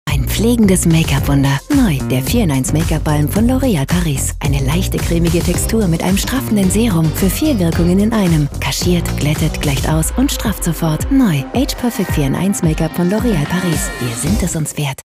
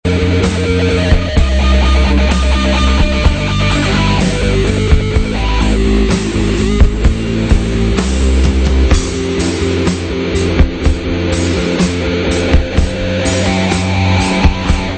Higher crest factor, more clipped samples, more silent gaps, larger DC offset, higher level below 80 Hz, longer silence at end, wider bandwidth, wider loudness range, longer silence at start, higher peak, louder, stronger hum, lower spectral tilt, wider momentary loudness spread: about the same, 12 dB vs 12 dB; second, under 0.1% vs 0.1%; neither; neither; second, -24 dBFS vs -14 dBFS; about the same, 0.1 s vs 0 s; first, 16 kHz vs 9 kHz; about the same, 2 LU vs 2 LU; about the same, 0.05 s vs 0.05 s; about the same, -2 dBFS vs 0 dBFS; about the same, -15 LUFS vs -13 LUFS; neither; about the same, -5.5 dB/octave vs -5.5 dB/octave; about the same, 4 LU vs 4 LU